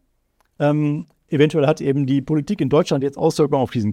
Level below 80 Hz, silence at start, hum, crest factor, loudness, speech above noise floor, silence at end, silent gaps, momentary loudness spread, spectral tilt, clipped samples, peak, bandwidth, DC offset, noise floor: -54 dBFS; 0.6 s; none; 16 dB; -19 LUFS; 47 dB; 0 s; none; 5 LU; -7 dB/octave; under 0.1%; -2 dBFS; 13.5 kHz; under 0.1%; -65 dBFS